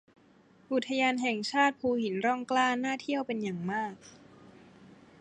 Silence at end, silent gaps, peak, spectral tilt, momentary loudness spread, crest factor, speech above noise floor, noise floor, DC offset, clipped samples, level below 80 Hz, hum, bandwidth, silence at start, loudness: 0.3 s; none; -12 dBFS; -4.5 dB/octave; 7 LU; 20 dB; 31 dB; -61 dBFS; under 0.1%; under 0.1%; -74 dBFS; none; 9.8 kHz; 0.7 s; -30 LUFS